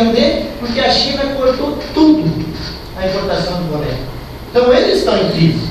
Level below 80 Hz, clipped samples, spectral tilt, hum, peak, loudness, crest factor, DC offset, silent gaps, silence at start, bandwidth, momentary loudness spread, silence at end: -32 dBFS; under 0.1%; -6 dB/octave; none; 0 dBFS; -14 LUFS; 14 dB; under 0.1%; none; 0 s; 14 kHz; 12 LU; 0 s